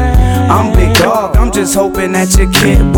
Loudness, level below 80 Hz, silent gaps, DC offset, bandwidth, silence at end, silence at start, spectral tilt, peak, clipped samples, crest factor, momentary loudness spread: -10 LUFS; -12 dBFS; none; under 0.1%; 19 kHz; 0 s; 0 s; -5 dB/octave; 0 dBFS; 0.3%; 8 dB; 4 LU